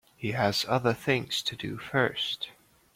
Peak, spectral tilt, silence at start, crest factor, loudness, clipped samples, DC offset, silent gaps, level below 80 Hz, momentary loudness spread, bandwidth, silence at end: -10 dBFS; -4.5 dB/octave; 0.2 s; 20 dB; -29 LUFS; under 0.1%; under 0.1%; none; -62 dBFS; 9 LU; 16.5 kHz; 0.45 s